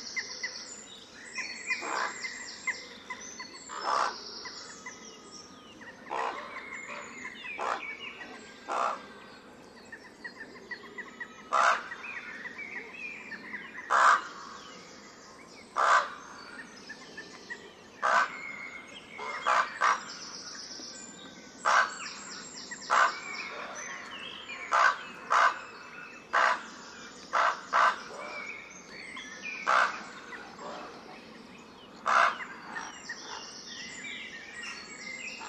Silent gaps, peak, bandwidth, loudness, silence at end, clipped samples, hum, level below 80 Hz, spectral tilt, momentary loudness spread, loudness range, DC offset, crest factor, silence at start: none; -10 dBFS; 13 kHz; -31 LUFS; 0 s; under 0.1%; none; -74 dBFS; -1 dB/octave; 21 LU; 8 LU; under 0.1%; 24 dB; 0 s